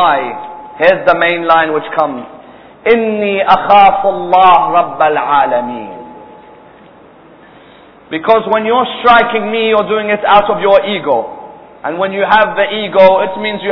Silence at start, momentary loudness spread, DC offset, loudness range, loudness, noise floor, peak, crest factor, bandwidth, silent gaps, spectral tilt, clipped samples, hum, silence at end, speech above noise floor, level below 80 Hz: 0 s; 15 LU; under 0.1%; 7 LU; -11 LUFS; -39 dBFS; 0 dBFS; 12 dB; 5.4 kHz; none; -7 dB/octave; 0.7%; none; 0 s; 29 dB; -48 dBFS